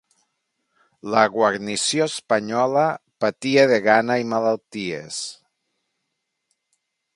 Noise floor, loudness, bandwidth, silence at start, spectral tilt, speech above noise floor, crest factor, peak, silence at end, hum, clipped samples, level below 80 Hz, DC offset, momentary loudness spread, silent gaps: -78 dBFS; -20 LUFS; 11.5 kHz; 1.05 s; -3.5 dB/octave; 57 dB; 22 dB; 0 dBFS; 1.8 s; none; under 0.1%; -68 dBFS; under 0.1%; 12 LU; none